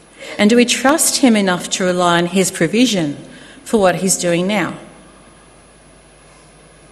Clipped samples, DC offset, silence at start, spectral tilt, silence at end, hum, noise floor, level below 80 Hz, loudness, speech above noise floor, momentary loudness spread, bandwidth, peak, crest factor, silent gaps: under 0.1%; under 0.1%; 0.2 s; -3.5 dB/octave; 2.05 s; none; -45 dBFS; -52 dBFS; -14 LUFS; 31 dB; 12 LU; 13 kHz; 0 dBFS; 16 dB; none